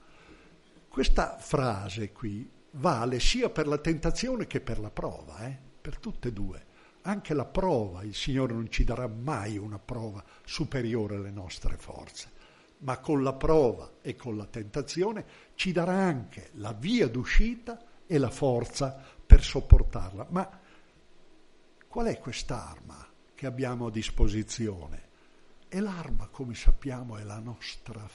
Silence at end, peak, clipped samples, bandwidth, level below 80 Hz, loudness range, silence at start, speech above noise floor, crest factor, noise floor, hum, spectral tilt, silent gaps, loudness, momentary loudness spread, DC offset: 0.05 s; 0 dBFS; under 0.1%; 11 kHz; -30 dBFS; 10 LU; 0.95 s; 29 dB; 28 dB; -57 dBFS; none; -6 dB/octave; none; -31 LUFS; 15 LU; under 0.1%